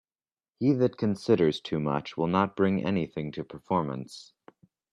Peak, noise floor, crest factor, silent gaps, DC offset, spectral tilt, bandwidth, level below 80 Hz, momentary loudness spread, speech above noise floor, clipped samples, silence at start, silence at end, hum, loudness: -10 dBFS; under -90 dBFS; 20 dB; none; under 0.1%; -7.5 dB/octave; 11 kHz; -64 dBFS; 13 LU; over 63 dB; under 0.1%; 0.6 s; 0.7 s; none; -28 LUFS